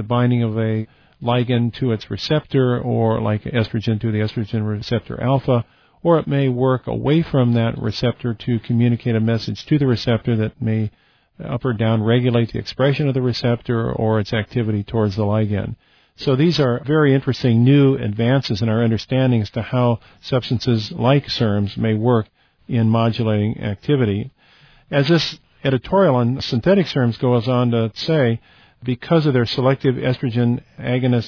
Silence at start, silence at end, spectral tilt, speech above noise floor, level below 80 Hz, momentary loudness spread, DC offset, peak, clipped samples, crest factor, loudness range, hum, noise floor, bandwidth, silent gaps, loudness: 0 s; 0 s; -8 dB/octave; 33 dB; -48 dBFS; 7 LU; under 0.1%; -2 dBFS; under 0.1%; 16 dB; 3 LU; none; -51 dBFS; 5.4 kHz; none; -19 LUFS